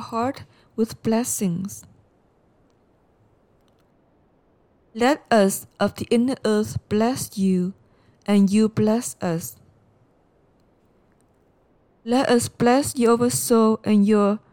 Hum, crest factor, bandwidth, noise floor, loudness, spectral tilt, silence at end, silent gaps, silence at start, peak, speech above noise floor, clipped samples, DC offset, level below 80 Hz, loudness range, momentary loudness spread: none; 16 dB; 18 kHz; -61 dBFS; -21 LUFS; -5.5 dB/octave; 0.15 s; none; 0 s; -6 dBFS; 40 dB; under 0.1%; under 0.1%; -58 dBFS; 9 LU; 12 LU